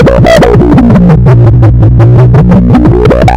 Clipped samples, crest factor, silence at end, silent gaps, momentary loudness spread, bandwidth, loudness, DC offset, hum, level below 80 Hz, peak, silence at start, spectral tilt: 20%; 2 dB; 0 s; none; 1 LU; 9.4 kHz; -3 LUFS; 4%; none; -12 dBFS; 0 dBFS; 0 s; -8.5 dB/octave